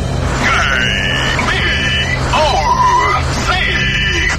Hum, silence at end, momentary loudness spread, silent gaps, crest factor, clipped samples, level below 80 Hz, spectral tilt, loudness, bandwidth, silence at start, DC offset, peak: none; 0 s; 3 LU; none; 12 dB; under 0.1%; -22 dBFS; -3.5 dB/octave; -13 LUFS; 14 kHz; 0 s; 1%; -2 dBFS